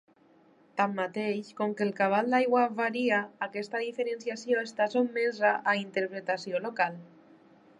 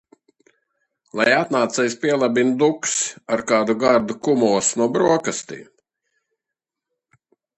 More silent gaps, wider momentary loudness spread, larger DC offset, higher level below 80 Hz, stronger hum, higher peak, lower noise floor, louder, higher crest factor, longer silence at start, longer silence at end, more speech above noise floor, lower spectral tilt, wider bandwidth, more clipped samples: neither; about the same, 8 LU vs 8 LU; neither; second, -86 dBFS vs -64 dBFS; neither; second, -12 dBFS vs -2 dBFS; second, -62 dBFS vs -85 dBFS; second, -29 LUFS vs -19 LUFS; about the same, 18 dB vs 18 dB; second, 0.75 s vs 1.15 s; second, 0.75 s vs 1.95 s; second, 32 dB vs 66 dB; first, -5.5 dB/octave vs -3.5 dB/octave; about the same, 10.5 kHz vs 10.5 kHz; neither